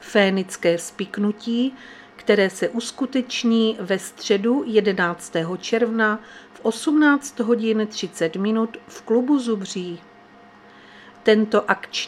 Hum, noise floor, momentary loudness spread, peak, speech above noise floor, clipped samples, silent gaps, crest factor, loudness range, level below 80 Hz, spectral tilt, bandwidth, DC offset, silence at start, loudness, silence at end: none; -48 dBFS; 9 LU; 0 dBFS; 27 dB; under 0.1%; none; 22 dB; 3 LU; -68 dBFS; -4.5 dB/octave; 14 kHz; under 0.1%; 0 s; -21 LUFS; 0 s